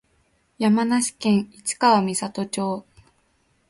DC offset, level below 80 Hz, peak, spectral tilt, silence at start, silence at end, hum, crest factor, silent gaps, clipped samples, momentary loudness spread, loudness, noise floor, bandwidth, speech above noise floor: under 0.1%; -64 dBFS; -4 dBFS; -4.5 dB/octave; 0.6 s; 0.9 s; none; 20 dB; none; under 0.1%; 10 LU; -22 LUFS; -65 dBFS; 11.5 kHz; 44 dB